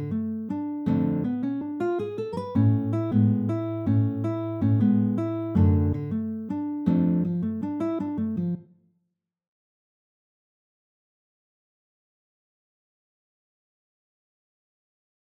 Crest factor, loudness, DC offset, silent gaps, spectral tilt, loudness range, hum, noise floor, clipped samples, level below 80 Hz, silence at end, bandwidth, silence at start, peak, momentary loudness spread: 18 dB; -26 LUFS; under 0.1%; none; -11 dB/octave; 9 LU; none; -78 dBFS; under 0.1%; -54 dBFS; 6.6 s; 5.6 kHz; 0 s; -10 dBFS; 9 LU